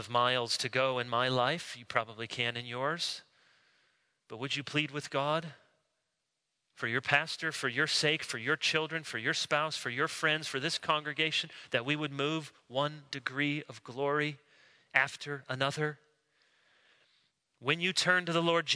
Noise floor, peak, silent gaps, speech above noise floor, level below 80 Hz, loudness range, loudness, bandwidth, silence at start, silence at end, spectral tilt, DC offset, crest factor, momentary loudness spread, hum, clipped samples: -84 dBFS; -10 dBFS; none; 51 dB; -80 dBFS; 5 LU; -32 LUFS; 11 kHz; 0 s; 0 s; -3.5 dB/octave; under 0.1%; 24 dB; 9 LU; none; under 0.1%